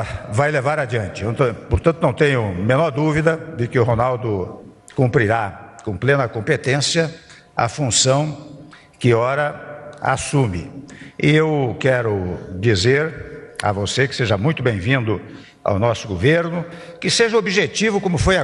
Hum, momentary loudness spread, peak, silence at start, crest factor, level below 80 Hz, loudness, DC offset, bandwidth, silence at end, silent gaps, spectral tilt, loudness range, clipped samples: none; 12 LU; -2 dBFS; 0 s; 16 dB; -40 dBFS; -19 LUFS; under 0.1%; 11.5 kHz; 0 s; none; -5 dB/octave; 1 LU; under 0.1%